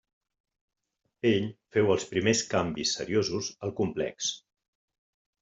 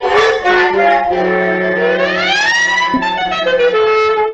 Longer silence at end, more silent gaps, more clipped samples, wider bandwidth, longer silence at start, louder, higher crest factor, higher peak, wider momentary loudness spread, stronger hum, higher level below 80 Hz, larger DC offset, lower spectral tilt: first, 1.05 s vs 0 s; neither; neither; about the same, 8.2 kHz vs 8.8 kHz; first, 1.25 s vs 0 s; second, -28 LUFS vs -12 LUFS; first, 20 dB vs 12 dB; second, -10 dBFS vs 0 dBFS; first, 7 LU vs 4 LU; neither; second, -64 dBFS vs -44 dBFS; neither; about the same, -4 dB/octave vs -3.5 dB/octave